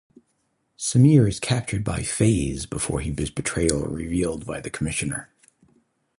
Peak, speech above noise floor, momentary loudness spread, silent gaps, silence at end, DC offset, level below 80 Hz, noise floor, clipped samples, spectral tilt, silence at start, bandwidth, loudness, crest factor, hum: -2 dBFS; 49 dB; 12 LU; none; 0.95 s; under 0.1%; -40 dBFS; -71 dBFS; under 0.1%; -5.5 dB/octave; 0.8 s; 11.5 kHz; -23 LUFS; 22 dB; none